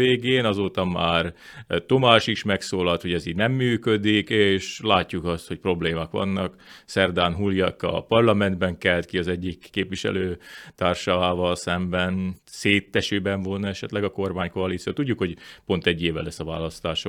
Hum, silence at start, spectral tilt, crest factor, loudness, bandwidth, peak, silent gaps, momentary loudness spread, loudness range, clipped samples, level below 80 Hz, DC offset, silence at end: none; 0 s; -5.5 dB/octave; 24 dB; -23 LUFS; 14 kHz; 0 dBFS; none; 9 LU; 4 LU; under 0.1%; -54 dBFS; under 0.1%; 0 s